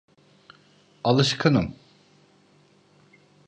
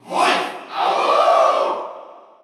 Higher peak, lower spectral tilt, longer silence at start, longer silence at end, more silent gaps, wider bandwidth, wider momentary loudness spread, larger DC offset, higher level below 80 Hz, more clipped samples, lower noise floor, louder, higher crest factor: about the same, -6 dBFS vs -4 dBFS; first, -5.5 dB/octave vs -2.5 dB/octave; first, 1.05 s vs 0.05 s; first, 1.75 s vs 0.25 s; neither; second, 9.6 kHz vs 13.5 kHz; second, 9 LU vs 12 LU; neither; first, -54 dBFS vs -86 dBFS; neither; first, -59 dBFS vs -40 dBFS; second, -23 LUFS vs -17 LUFS; first, 22 dB vs 14 dB